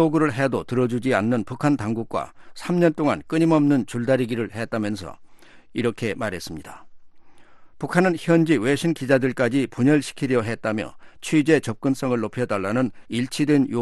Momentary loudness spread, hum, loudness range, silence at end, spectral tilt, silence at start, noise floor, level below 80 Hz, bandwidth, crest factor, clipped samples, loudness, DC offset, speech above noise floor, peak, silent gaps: 11 LU; none; 6 LU; 0 s; -6.5 dB/octave; 0 s; -44 dBFS; -56 dBFS; 12.5 kHz; 18 dB; under 0.1%; -22 LUFS; under 0.1%; 22 dB; -4 dBFS; none